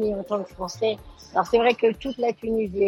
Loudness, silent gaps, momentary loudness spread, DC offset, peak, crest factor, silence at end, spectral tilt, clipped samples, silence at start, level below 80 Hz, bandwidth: -24 LUFS; none; 9 LU; under 0.1%; -6 dBFS; 18 dB; 0 s; -5 dB/octave; under 0.1%; 0 s; -50 dBFS; 16.5 kHz